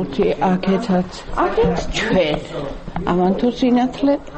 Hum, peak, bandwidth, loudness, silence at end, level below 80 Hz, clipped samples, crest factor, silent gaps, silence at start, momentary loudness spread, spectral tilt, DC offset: none; -6 dBFS; 8.4 kHz; -19 LUFS; 0 s; -34 dBFS; under 0.1%; 12 dB; none; 0 s; 9 LU; -6.5 dB/octave; under 0.1%